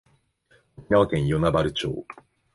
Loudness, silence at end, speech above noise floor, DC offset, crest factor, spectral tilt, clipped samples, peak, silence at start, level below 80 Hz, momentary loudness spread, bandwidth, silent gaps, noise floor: -23 LUFS; 0.4 s; 41 dB; under 0.1%; 18 dB; -7 dB/octave; under 0.1%; -8 dBFS; 0.8 s; -44 dBFS; 13 LU; 11.5 kHz; none; -63 dBFS